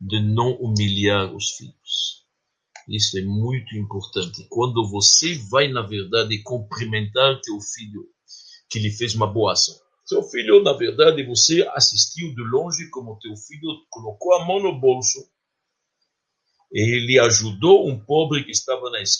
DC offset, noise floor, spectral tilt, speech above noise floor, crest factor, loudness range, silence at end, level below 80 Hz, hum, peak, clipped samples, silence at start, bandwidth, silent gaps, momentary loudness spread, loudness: under 0.1%; -78 dBFS; -3 dB/octave; 58 dB; 20 dB; 6 LU; 0 s; -62 dBFS; none; -2 dBFS; under 0.1%; 0 s; 10.5 kHz; none; 15 LU; -19 LUFS